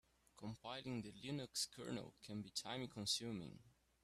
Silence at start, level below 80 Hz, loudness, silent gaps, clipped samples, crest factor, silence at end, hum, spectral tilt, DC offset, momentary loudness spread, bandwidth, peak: 0.35 s; -76 dBFS; -47 LUFS; none; under 0.1%; 22 dB; 0.35 s; none; -3.5 dB/octave; under 0.1%; 12 LU; 14 kHz; -26 dBFS